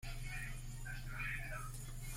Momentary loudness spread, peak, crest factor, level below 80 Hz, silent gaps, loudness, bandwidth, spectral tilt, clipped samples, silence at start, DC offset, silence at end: 6 LU; -32 dBFS; 12 dB; -48 dBFS; none; -46 LUFS; 16.5 kHz; -3.5 dB/octave; under 0.1%; 0 s; under 0.1%; 0 s